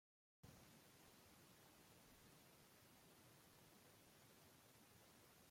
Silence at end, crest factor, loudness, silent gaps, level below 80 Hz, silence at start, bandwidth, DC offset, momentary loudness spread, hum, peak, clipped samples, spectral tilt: 0 s; 18 dB; -68 LUFS; none; -86 dBFS; 0.45 s; 16.5 kHz; under 0.1%; 1 LU; none; -52 dBFS; under 0.1%; -3.5 dB/octave